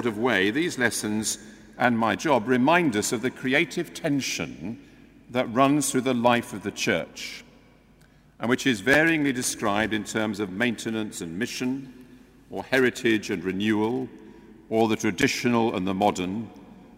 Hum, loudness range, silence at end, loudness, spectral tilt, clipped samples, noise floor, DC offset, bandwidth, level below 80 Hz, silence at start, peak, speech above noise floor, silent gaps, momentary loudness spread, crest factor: none; 3 LU; 0.1 s; -25 LUFS; -4 dB/octave; under 0.1%; -56 dBFS; under 0.1%; 16 kHz; -58 dBFS; 0 s; -4 dBFS; 31 dB; none; 13 LU; 22 dB